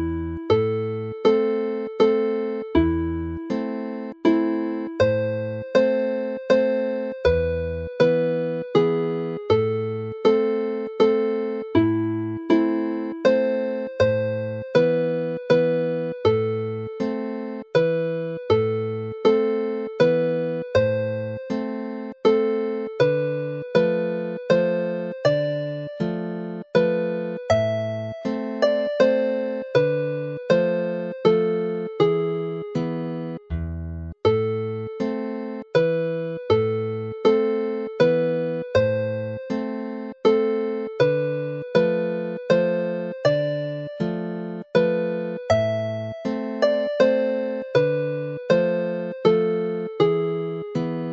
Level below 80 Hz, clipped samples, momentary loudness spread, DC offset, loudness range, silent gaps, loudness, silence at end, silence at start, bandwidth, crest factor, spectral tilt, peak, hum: -48 dBFS; under 0.1%; 9 LU; under 0.1%; 2 LU; none; -23 LUFS; 0 s; 0 s; 7.4 kHz; 18 dB; -7.5 dB/octave; -4 dBFS; none